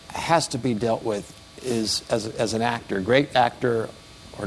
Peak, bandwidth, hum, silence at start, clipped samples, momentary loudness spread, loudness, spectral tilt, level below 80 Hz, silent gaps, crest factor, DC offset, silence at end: -4 dBFS; 12 kHz; none; 0 s; under 0.1%; 14 LU; -24 LUFS; -4.5 dB/octave; -54 dBFS; none; 20 dB; under 0.1%; 0 s